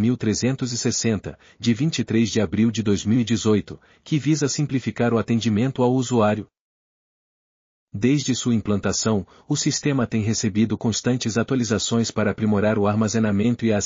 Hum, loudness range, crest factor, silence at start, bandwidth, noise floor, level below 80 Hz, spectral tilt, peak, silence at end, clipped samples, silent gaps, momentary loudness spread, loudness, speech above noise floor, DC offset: none; 2 LU; 16 dB; 0 s; 7.4 kHz; under -90 dBFS; -56 dBFS; -6 dB/octave; -6 dBFS; 0 s; under 0.1%; 6.60-7.87 s; 4 LU; -22 LUFS; over 69 dB; under 0.1%